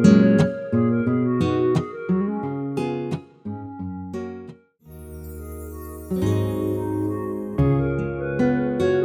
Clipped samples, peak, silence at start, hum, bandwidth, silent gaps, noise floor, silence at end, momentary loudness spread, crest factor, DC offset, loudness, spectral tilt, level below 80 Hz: under 0.1%; -2 dBFS; 0 s; none; 16.5 kHz; none; -45 dBFS; 0 s; 16 LU; 20 dB; under 0.1%; -23 LUFS; -8 dB/octave; -42 dBFS